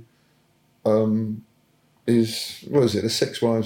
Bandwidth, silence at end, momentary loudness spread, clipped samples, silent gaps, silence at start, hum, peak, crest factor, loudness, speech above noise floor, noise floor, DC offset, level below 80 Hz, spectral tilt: 17.5 kHz; 0 s; 10 LU; under 0.1%; none; 0.85 s; none; -6 dBFS; 18 dB; -23 LUFS; 41 dB; -62 dBFS; under 0.1%; -70 dBFS; -5.5 dB/octave